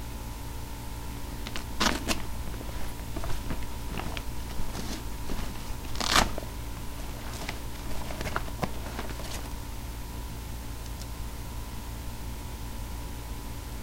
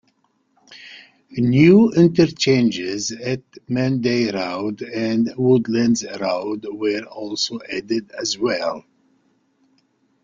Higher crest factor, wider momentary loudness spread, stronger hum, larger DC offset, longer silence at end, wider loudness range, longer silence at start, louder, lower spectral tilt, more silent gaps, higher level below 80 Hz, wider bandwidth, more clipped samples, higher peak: first, 26 dB vs 18 dB; about the same, 11 LU vs 13 LU; neither; first, 0.2% vs under 0.1%; second, 0 s vs 1.45 s; about the same, 8 LU vs 8 LU; second, 0 s vs 0.7 s; second, -35 LUFS vs -19 LUFS; second, -3.5 dB/octave vs -5.5 dB/octave; neither; first, -38 dBFS vs -58 dBFS; first, 16 kHz vs 7.6 kHz; neither; second, -6 dBFS vs -2 dBFS